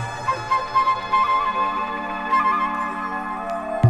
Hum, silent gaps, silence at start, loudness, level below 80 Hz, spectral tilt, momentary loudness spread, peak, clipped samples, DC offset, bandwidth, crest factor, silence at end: none; none; 0 s; -22 LUFS; -50 dBFS; -6 dB/octave; 8 LU; -4 dBFS; under 0.1%; under 0.1%; 11.5 kHz; 18 dB; 0 s